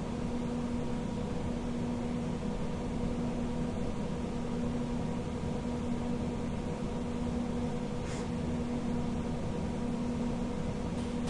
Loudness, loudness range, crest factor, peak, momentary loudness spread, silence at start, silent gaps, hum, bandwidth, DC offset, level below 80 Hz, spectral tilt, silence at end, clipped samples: -35 LUFS; 0 LU; 12 dB; -22 dBFS; 2 LU; 0 s; none; none; 11 kHz; under 0.1%; -44 dBFS; -7 dB/octave; 0 s; under 0.1%